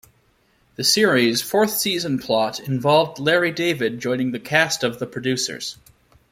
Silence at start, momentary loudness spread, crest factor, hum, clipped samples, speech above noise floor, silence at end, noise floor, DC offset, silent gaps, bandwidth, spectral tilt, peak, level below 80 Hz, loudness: 0.8 s; 8 LU; 18 dB; none; under 0.1%; 41 dB; 0.6 s; -61 dBFS; under 0.1%; none; 16.5 kHz; -3.5 dB/octave; -2 dBFS; -60 dBFS; -20 LUFS